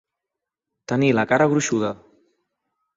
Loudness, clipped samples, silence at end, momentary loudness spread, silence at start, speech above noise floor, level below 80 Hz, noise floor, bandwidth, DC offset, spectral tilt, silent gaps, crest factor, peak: -20 LUFS; under 0.1%; 1 s; 10 LU; 0.9 s; 66 dB; -60 dBFS; -85 dBFS; 8 kHz; under 0.1%; -5.5 dB/octave; none; 20 dB; -4 dBFS